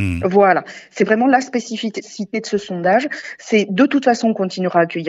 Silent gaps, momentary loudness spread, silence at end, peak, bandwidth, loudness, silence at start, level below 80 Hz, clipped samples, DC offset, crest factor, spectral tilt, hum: none; 12 LU; 0 s; 0 dBFS; 9.2 kHz; -17 LUFS; 0 s; -48 dBFS; under 0.1%; under 0.1%; 16 dB; -5.5 dB/octave; none